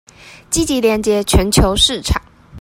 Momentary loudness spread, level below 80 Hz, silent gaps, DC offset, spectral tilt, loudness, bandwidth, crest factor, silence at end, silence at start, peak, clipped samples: 8 LU; -24 dBFS; none; under 0.1%; -4 dB/octave; -15 LUFS; 16.5 kHz; 16 dB; 0 s; 0.25 s; 0 dBFS; under 0.1%